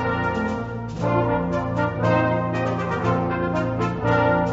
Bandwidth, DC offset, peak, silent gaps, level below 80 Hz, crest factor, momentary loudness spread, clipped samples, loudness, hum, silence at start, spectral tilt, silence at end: 7.8 kHz; under 0.1%; -6 dBFS; none; -42 dBFS; 16 dB; 5 LU; under 0.1%; -23 LUFS; none; 0 s; -8 dB/octave; 0 s